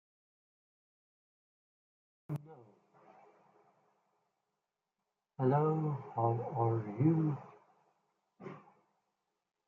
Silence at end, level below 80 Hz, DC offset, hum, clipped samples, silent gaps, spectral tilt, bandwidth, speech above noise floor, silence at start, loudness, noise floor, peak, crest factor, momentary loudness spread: 1.1 s; -82 dBFS; under 0.1%; none; under 0.1%; none; -11.5 dB/octave; 3.3 kHz; 56 dB; 2.3 s; -34 LUFS; -89 dBFS; -18 dBFS; 20 dB; 21 LU